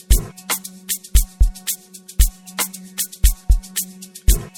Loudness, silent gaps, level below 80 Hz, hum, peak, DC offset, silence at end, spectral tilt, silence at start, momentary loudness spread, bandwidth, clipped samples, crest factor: -22 LUFS; none; -20 dBFS; none; -2 dBFS; under 0.1%; 0.1 s; -3 dB/octave; 0.1 s; 6 LU; 18.5 kHz; under 0.1%; 18 dB